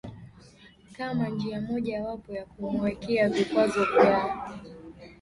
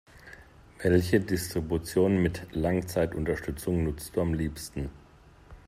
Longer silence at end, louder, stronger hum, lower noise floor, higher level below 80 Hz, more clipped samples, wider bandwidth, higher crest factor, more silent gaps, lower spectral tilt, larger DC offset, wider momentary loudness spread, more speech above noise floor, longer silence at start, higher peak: about the same, 0.05 s vs 0.1 s; about the same, -27 LUFS vs -29 LUFS; neither; about the same, -54 dBFS vs -55 dBFS; second, -56 dBFS vs -46 dBFS; neither; second, 11.5 kHz vs 16 kHz; about the same, 22 dB vs 20 dB; neither; about the same, -6.5 dB/octave vs -6.5 dB/octave; neither; first, 21 LU vs 13 LU; about the same, 27 dB vs 27 dB; about the same, 0.05 s vs 0.15 s; first, -6 dBFS vs -10 dBFS